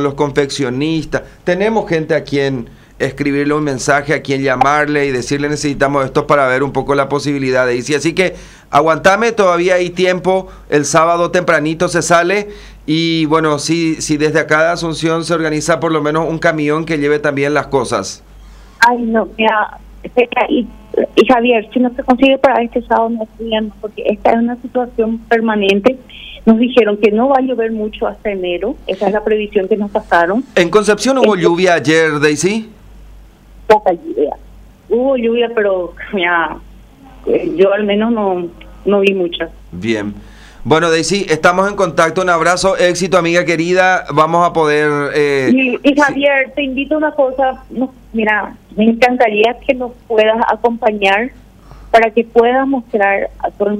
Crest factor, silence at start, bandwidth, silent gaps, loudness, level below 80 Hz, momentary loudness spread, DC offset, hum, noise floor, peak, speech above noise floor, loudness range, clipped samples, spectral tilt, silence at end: 14 dB; 0 s; 15 kHz; none; -13 LUFS; -40 dBFS; 8 LU; under 0.1%; none; -39 dBFS; 0 dBFS; 25 dB; 4 LU; under 0.1%; -5 dB/octave; 0 s